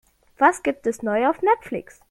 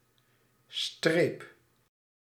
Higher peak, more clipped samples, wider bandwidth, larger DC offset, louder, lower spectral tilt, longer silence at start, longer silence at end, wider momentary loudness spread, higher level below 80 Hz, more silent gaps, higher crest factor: first, -2 dBFS vs -10 dBFS; neither; second, 14 kHz vs 15.5 kHz; neither; first, -21 LUFS vs -30 LUFS; about the same, -4.5 dB/octave vs -4.5 dB/octave; second, 0.4 s vs 0.7 s; second, 0.3 s vs 0.9 s; second, 10 LU vs 19 LU; first, -60 dBFS vs -80 dBFS; neither; about the same, 20 dB vs 24 dB